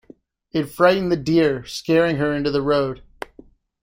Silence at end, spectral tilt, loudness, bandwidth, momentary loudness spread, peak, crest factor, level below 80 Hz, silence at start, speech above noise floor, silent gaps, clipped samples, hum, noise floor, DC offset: 0.85 s; -6 dB/octave; -20 LUFS; 16 kHz; 18 LU; -2 dBFS; 18 dB; -48 dBFS; 0.55 s; 31 dB; none; under 0.1%; none; -50 dBFS; under 0.1%